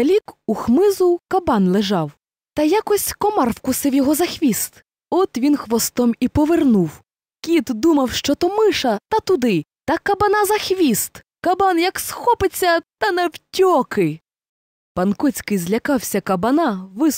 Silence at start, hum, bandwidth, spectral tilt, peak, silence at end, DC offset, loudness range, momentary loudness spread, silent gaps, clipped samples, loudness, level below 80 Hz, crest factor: 0 s; none; 16 kHz; -4.5 dB/octave; -6 dBFS; 0 s; under 0.1%; 2 LU; 7 LU; 14.49-14.95 s; under 0.1%; -18 LUFS; -46 dBFS; 12 dB